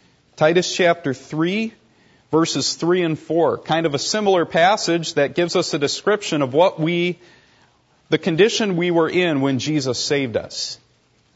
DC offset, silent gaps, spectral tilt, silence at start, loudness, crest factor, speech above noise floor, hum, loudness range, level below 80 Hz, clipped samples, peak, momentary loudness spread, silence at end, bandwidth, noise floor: under 0.1%; none; -4.5 dB/octave; 0.4 s; -19 LUFS; 18 dB; 38 dB; none; 2 LU; -64 dBFS; under 0.1%; -2 dBFS; 8 LU; 0.6 s; 8 kHz; -57 dBFS